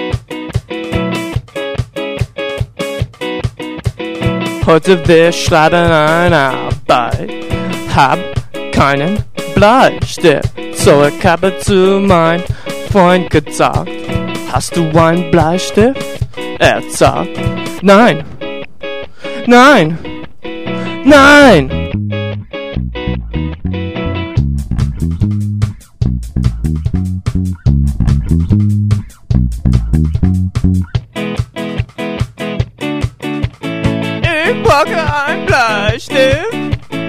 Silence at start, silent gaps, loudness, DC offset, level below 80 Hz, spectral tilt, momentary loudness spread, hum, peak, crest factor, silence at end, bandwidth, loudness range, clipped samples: 0 s; none; -12 LUFS; under 0.1%; -24 dBFS; -6 dB/octave; 12 LU; none; 0 dBFS; 12 dB; 0 s; 16 kHz; 8 LU; 0.4%